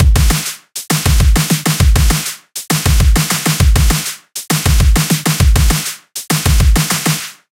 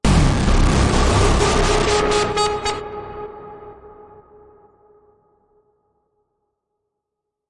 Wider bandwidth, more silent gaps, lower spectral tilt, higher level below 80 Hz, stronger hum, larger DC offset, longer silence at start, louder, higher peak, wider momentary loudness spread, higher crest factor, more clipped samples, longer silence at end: first, 17 kHz vs 11.5 kHz; neither; about the same, -4 dB/octave vs -5 dB/octave; first, -14 dBFS vs -24 dBFS; neither; neither; about the same, 0 s vs 0.05 s; first, -13 LUFS vs -17 LUFS; first, 0 dBFS vs -4 dBFS; second, 10 LU vs 19 LU; about the same, 12 dB vs 16 dB; neither; second, 0.2 s vs 3.6 s